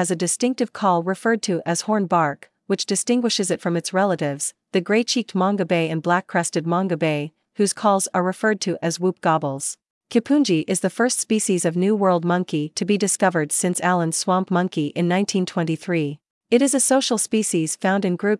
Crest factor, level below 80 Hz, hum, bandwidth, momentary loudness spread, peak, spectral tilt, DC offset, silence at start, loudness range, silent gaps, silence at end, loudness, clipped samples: 16 dB; -76 dBFS; none; 12 kHz; 6 LU; -4 dBFS; -4.5 dB/octave; under 0.1%; 0 s; 2 LU; 9.90-10.01 s, 16.30-16.41 s; 0 s; -21 LUFS; under 0.1%